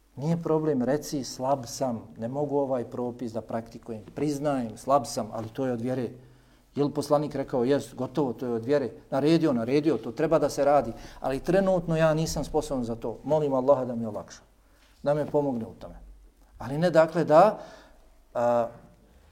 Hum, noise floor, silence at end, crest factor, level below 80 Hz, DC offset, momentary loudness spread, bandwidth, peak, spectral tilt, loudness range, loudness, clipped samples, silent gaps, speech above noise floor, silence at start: none; -59 dBFS; 0.5 s; 20 dB; -52 dBFS; under 0.1%; 13 LU; 16.5 kHz; -6 dBFS; -6.5 dB/octave; 5 LU; -27 LUFS; under 0.1%; none; 32 dB; 0.15 s